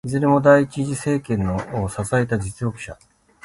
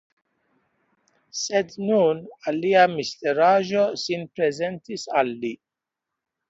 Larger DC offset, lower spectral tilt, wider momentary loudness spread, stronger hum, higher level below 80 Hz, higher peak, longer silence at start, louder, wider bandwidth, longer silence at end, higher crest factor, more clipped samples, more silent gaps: neither; first, -7 dB/octave vs -4.5 dB/octave; about the same, 13 LU vs 13 LU; neither; first, -44 dBFS vs -70 dBFS; about the same, -2 dBFS vs -4 dBFS; second, 0.05 s vs 1.35 s; first, -20 LUFS vs -23 LUFS; first, 11.5 kHz vs 8 kHz; second, 0.5 s vs 0.95 s; about the same, 18 dB vs 20 dB; neither; neither